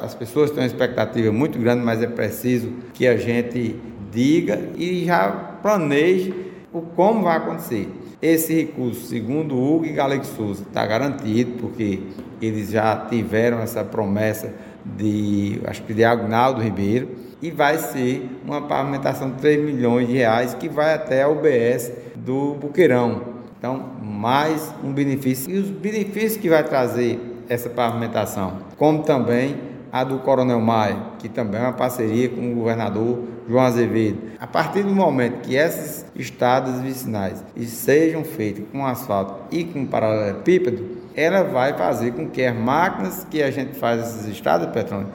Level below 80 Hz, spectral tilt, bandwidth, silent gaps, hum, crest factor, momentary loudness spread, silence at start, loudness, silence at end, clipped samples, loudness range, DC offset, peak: -56 dBFS; -6.5 dB/octave; 17 kHz; none; none; 20 dB; 10 LU; 0 s; -21 LUFS; 0 s; under 0.1%; 3 LU; under 0.1%; -2 dBFS